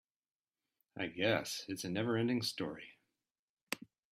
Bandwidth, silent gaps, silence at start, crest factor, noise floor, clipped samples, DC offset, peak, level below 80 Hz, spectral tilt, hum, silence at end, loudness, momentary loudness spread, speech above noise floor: 16 kHz; 3.31-3.67 s; 0.95 s; 24 dB; under -90 dBFS; under 0.1%; under 0.1%; -16 dBFS; -76 dBFS; -4.5 dB/octave; none; 0.35 s; -38 LUFS; 13 LU; over 53 dB